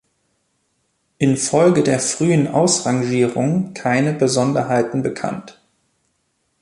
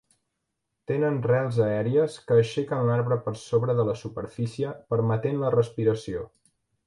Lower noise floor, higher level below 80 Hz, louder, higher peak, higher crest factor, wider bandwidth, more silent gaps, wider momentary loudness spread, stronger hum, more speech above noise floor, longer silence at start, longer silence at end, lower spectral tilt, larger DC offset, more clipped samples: second, -68 dBFS vs -81 dBFS; about the same, -58 dBFS vs -58 dBFS; first, -17 LUFS vs -26 LUFS; first, -2 dBFS vs -8 dBFS; about the same, 16 dB vs 16 dB; about the same, 11.5 kHz vs 11.5 kHz; neither; second, 7 LU vs 10 LU; neither; second, 51 dB vs 56 dB; first, 1.2 s vs 0.9 s; first, 1.1 s vs 0.6 s; second, -5 dB/octave vs -7.5 dB/octave; neither; neither